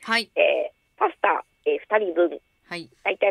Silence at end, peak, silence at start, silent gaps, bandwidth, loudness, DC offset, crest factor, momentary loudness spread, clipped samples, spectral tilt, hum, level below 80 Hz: 0 s; -6 dBFS; 0 s; none; 13 kHz; -24 LUFS; under 0.1%; 18 dB; 15 LU; under 0.1%; -3.5 dB/octave; none; -72 dBFS